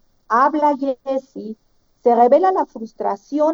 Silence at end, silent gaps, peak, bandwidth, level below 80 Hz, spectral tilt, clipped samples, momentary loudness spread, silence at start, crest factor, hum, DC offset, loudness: 0 s; none; -2 dBFS; 7.2 kHz; -64 dBFS; -6.5 dB/octave; under 0.1%; 15 LU; 0.3 s; 16 dB; none; under 0.1%; -18 LUFS